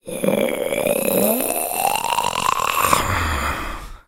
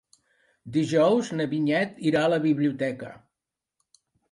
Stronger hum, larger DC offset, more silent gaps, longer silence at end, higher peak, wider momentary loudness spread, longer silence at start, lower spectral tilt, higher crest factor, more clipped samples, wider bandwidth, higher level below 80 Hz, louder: neither; neither; neither; second, 0.1 s vs 1.15 s; first, 0 dBFS vs -10 dBFS; second, 5 LU vs 9 LU; second, 0.05 s vs 0.65 s; second, -3 dB/octave vs -6.5 dB/octave; about the same, 20 dB vs 16 dB; neither; first, 19 kHz vs 11.5 kHz; first, -36 dBFS vs -70 dBFS; first, -19 LUFS vs -24 LUFS